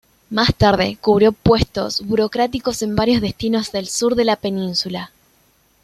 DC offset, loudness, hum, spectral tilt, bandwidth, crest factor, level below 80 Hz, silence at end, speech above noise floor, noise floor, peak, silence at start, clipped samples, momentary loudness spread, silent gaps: under 0.1%; -18 LUFS; none; -5 dB/octave; 14.5 kHz; 16 dB; -38 dBFS; 0.75 s; 40 dB; -58 dBFS; -2 dBFS; 0.3 s; under 0.1%; 8 LU; none